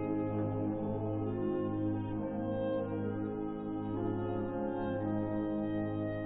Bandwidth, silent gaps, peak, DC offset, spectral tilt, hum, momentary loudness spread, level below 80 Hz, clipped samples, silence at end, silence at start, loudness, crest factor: 3.9 kHz; none; -22 dBFS; under 0.1%; -7 dB/octave; none; 3 LU; -56 dBFS; under 0.1%; 0 s; 0 s; -36 LUFS; 12 dB